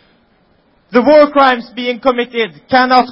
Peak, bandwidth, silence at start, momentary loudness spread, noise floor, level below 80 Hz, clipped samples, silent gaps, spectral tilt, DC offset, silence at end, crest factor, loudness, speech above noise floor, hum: 0 dBFS; 6 kHz; 0.9 s; 10 LU; -54 dBFS; -50 dBFS; 0.1%; none; -6 dB/octave; under 0.1%; 0 s; 12 dB; -12 LUFS; 43 dB; none